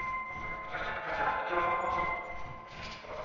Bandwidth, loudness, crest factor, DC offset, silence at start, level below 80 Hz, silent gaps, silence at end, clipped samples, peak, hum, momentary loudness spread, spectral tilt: 7.2 kHz; -34 LUFS; 18 dB; under 0.1%; 0 s; -54 dBFS; none; 0 s; under 0.1%; -18 dBFS; none; 13 LU; -2 dB/octave